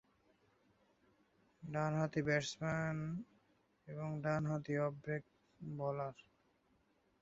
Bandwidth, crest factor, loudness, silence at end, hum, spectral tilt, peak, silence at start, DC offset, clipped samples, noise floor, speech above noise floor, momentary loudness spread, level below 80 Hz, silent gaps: 7.6 kHz; 22 dB; -41 LUFS; 1 s; none; -6 dB/octave; -22 dBFS; 1.6 s; under 0.1%; under 0.1%; -76 dBFS; 37 dB; 12 LU; -72 dBFS; none